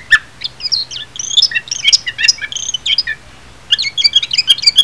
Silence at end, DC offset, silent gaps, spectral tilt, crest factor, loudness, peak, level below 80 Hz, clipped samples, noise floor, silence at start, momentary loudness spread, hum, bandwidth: 0 s; 0.8%; none; 2.5 dB/octave; 14 dB; -12 LUFS; 0 dBFS; -48 dBFS; 0.4%; -39 dBFS; 0 s; 12 LU; none; 11 kHz